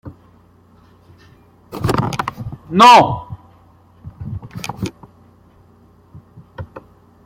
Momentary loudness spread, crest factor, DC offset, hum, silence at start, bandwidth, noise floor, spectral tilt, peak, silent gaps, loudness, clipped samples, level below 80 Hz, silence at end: 28 LU; 20 dB; under 0.1%; none; 0.05 s; 16.5 kHz; -49 dBFS; -5 dB/octave; 0 dBFS; none; -14 LUFS; under 0.1%; -46 dBFS; 0.45 s